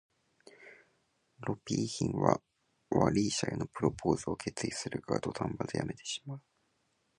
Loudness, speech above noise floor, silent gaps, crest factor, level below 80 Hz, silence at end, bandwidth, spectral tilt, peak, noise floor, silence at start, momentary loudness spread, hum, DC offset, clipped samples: -34 LUFS; 43 dB; none; 28 dB; -58 dBFS; 0.8 s; 11 kHz; -5 dB/octave; -8 dBFS; -76 dBFS; 0.6 s; 10 LU; none; under 0.1%; under 0.1%